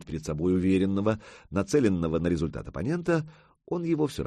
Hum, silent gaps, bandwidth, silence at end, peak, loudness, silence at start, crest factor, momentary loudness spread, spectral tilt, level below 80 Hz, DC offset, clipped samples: none; none; 12.5 kHz; 0 s; -10 dBFS; -28 LUFS; 0 s; 16 dB; 10 LU; -7 dB/octave; -48 dBFS; under 0.1%; under 0.1%